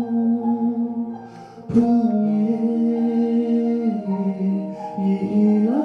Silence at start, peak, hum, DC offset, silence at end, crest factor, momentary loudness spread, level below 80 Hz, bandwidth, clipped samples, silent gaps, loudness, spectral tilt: 0 s; -6 dBFS; none; under 0.1%; 0 s; 14 dB; 10 LU; -60 dBFS; 5 kHz; under 0.1%; none; -21 LUFS; -10 dB/octave